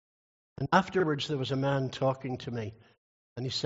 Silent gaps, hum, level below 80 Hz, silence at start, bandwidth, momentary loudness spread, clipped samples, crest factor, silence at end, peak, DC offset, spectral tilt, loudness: 2.98-3.36 s; none; -66 dBFS; 0.6 s; 8 kHz; 13 LU; under 0.1%; 24 dB; 0 s; -8 dBFS; under 0.1%; -4.5 dB/octave; -31 LUFS